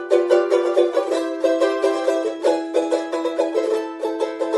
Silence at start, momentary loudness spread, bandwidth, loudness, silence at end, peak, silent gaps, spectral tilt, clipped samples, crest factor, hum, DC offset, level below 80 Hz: 0 s; 7 LU; 11.5 kHz; -20 LUFS; 0 s; -2 dBFS; none; -2.5 dB/octave; under 0.1%; 18 dB; none; under 0.1%; -82 dBFS